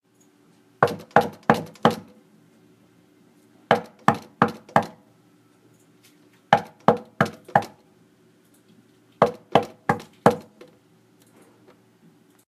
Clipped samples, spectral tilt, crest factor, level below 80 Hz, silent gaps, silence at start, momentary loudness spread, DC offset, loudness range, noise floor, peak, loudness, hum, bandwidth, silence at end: under 0.1%; -6 dB/octave; 26 dB; -62 dBFS; none; 0.8 s; 6 LU; under 0.1%; 1 LU; -59 dBFS; 0 dBFS; -23 LUFS; none; 15.5 kHz; 2.05 s